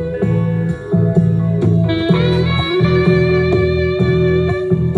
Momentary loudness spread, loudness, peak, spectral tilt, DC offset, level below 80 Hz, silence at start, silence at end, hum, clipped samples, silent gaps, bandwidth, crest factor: 4 LU; -15 LUFS; -2 dBFS; -9 dB/octave; under 0.1%; -34 dBFS; 0 s; 0 s; none; under 0.1%; none; 5.6 kHz; 12 dB